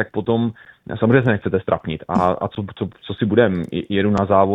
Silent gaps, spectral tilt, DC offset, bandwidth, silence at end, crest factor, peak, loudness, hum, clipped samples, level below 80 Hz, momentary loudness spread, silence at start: none; -8.5 dB/octave; under 0.1%; 7.8 kHz; 0 s; 18 dB; 0 dBFS; -20 LUFS; none; under 0.1%; -48 dBFS; 12 LU; 0 s